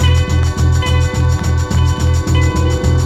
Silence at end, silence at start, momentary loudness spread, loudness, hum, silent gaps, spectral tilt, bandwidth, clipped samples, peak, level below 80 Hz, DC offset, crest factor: 0 s; 0 s; 2 LU; -14 LUFS; none; none; -5.5 dB/octave; 12.5 kHz; under 0.1%; 0 dBFS; -18 dBFS; under 0.1%; 12 dB